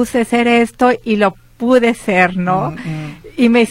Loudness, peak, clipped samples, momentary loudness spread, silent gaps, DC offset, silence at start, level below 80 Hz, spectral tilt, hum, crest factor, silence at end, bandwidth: -14 LUFS; 0 dBFS; under 0.1%; 12 LU; none; under 0.1%; 0 s; -46 dBFS; -6 dB/octave; none; 14 dB; 0 s; 14.5 kHz